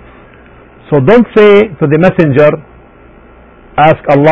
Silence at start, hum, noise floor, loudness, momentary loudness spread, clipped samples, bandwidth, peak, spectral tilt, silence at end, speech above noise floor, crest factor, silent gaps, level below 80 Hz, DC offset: 0.9 s; none; -37 dBFS; -8 LUFS; 7 LU; 1%; 6.8 kHz; 0 dBFS; -9 dB/octave; 0 s; 31 dB; 8 dB; none; -38 dBFS; under 0.1%